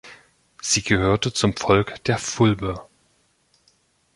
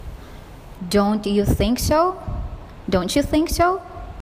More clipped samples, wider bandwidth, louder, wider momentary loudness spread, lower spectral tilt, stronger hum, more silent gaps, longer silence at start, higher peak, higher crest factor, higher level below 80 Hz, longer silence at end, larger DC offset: neither; second, 11.5 kHz vs 15.5 kHz; about the same, -21 LUFS vs -20 LUFS; second, 10 LU vs 19 LU; about the same, -4.5 dB/octave vs -5.5 dB/octave; neither; neither; about the same, 0.05 s vs 0 s; about the same, -2 dBFS vs -4 dBFS; about the same, 20 dB vs 16 dB; second, -44 dBFS vs -32 dBFS; first, 1.35 s vs 0 s; neither